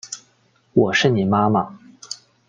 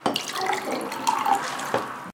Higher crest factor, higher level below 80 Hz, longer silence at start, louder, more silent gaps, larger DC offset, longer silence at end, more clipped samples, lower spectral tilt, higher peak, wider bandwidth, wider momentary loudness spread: about the same, 18 dB vs 20 dB; first, -58 dBFS vs -70 dBFS; about the same, 0.05 s vs 0 s; first, -18 LUFS vs -26 LUFS; neither; neither; first, 0.35 s vs 0 s; neither; first, -5.5 dB/octave vs -2.5 dB/octave; first, -2 dBFS vs -8 dBFS; second, 9.6 kHz vs 19 kHz; first, 18 LU vs 5 LU